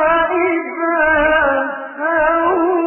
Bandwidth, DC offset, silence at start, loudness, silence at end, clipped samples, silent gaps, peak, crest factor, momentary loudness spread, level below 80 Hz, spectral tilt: 3.2 kHz; under 0.1%; 0 s; -15 LUFS; 0 s; under 0.1%; none; -2 dBFS; 14 dB; 6 LU; -42 dBFS; -10 dB/octave